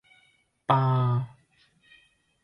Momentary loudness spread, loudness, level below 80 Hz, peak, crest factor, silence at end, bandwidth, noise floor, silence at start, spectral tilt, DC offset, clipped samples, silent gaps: 15 LU; -26 LUFS; -64 dBFS; -8 dBFS; 22 dB; 1.15 s; 5.4 kHz; -66 dBFS; 0.7 s; -9 dB/octave; under 0.1%; under 0.1%; none